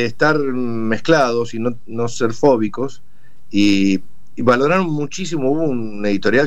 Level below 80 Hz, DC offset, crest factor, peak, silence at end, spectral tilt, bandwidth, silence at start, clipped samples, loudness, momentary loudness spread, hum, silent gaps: -52 dBFS; 6%; 16 dB; -2 dBFS; 0 s; -5.5 dB/octave; 8.8 kHz; 0 s; under 0.1%; -18 LUFS; 9 LU; none; none